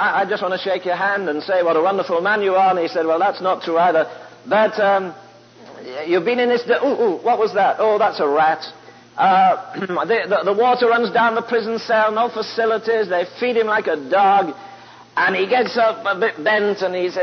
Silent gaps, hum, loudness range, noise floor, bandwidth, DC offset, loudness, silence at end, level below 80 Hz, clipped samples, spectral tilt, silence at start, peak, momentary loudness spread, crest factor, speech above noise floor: none; none; 2 LU; -42 dBFS; 6.6 kHz; under 0.1%; -18 LUFS; 0 s; -74 dBFS; under 0.1%; -5.5 dB/octave; 0 s; -4 dBFS; 6 LU; 14 dB; 25 dB